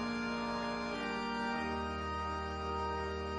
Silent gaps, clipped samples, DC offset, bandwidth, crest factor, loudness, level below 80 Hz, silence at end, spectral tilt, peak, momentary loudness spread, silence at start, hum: none; under 0.1%; under 0.1%; 10.5 kHz; 12 dB; -38 LUFS; -50 dBFS; 0 s; -5.5 dB/octave; -26 dBFS; 2 LU; 0 s; none